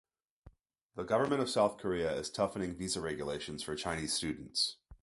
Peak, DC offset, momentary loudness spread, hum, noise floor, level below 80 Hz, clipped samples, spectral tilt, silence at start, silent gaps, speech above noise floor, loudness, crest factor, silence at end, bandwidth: -14 dBFS; under 0.1%; 8 LU; none; -62 dBFS; -60 dBFS; under 0.1%; -3.5 dB/octave; 0.45 s; 0.82-0.89 s; 27 dB; -35 LUFS; 20 dB; 0.1 s; 12 kHz